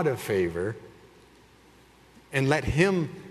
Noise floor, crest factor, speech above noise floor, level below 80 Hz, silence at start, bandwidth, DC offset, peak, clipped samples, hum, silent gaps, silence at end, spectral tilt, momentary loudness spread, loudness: -56 dBFS; 22 dB; 30 dB; -48 dBFS; 0 s; 13.5 kHz; under 0.1%; -6 dBFS; under 0.1%; none; none; 0 s; -6 dB/octave; 10 LU; -26 LUFS